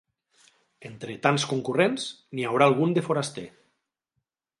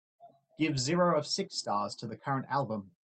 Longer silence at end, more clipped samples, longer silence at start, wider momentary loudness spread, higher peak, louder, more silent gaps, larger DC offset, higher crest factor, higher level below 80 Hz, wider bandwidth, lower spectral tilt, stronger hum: first, 1.1 s vs 0.15 s; neither; first, 0.8 s vs 0.2 s; first, 20 LU vs 9 LU; first, -4 dBFS vs -16 dBFS; first, -25 LUFS vs -32 LUFS; neither; neither; first, 22 dB vs 16 dB; about the same, -72 dBFS vs -70 dBFS; first, 11.5 kHz vs 9.2 kHz; about the same, -5 dB/octave vs -4.5 dB/octave; neither